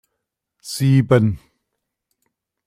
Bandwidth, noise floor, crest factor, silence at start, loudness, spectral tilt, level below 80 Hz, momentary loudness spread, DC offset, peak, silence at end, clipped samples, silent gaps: 16 kHz; -79 dBFS; 18 dB; 0.65 s; -17 LUFS; -7 dB/octave; -52 dBFS; 19 LU; under 0.1%; -2 dBFS; 1.3 s; under 0.1%; none